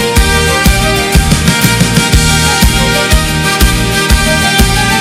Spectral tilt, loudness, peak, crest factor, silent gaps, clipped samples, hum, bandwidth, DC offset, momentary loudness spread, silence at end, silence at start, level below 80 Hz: -3.5 dB/octave; -9 LUFS; 0 dBFS; 8 dB; none; 0.5%; none; 16.5 kHz; under 0.1%; 2 LU; 0 s; 0 s; -14 dBFS